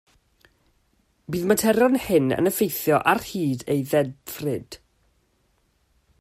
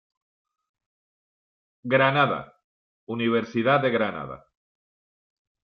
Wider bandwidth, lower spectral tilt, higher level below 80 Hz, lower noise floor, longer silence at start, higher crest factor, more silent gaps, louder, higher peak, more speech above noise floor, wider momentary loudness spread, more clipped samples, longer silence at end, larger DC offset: first, 16 kHz vs 6.4 kHz; second, -5 dB/octave vs -7.5 dB/octave; first, -56 dBFS vs -68 dBFS; second, -67 dBFS vs under -90 dBFS; second, 1.3 s vs 1.85 s; about the same, 20 dB vs 20 dB; second, none vs 2.64-3.07 s; about the same, -22 LUFS vs -23 LUFS; about the same, -4 dBFS vs -6 dBFS; second, 45 dB vs over 67 dB; second, 12 LU vs 17 LU; neither; about the same, 1.45 s vs 1.4 s; neither